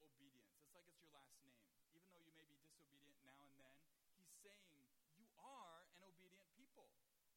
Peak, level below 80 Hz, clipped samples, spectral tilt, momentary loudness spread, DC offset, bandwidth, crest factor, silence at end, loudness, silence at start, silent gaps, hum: -50 dBFS; under -90 dBFS; under 0.1%; -2.5 dB/octave; 6 LU; under 0.1%; 16.5 kHz; 22 dB; 0 s; -66 LUFS; 0 s; none; none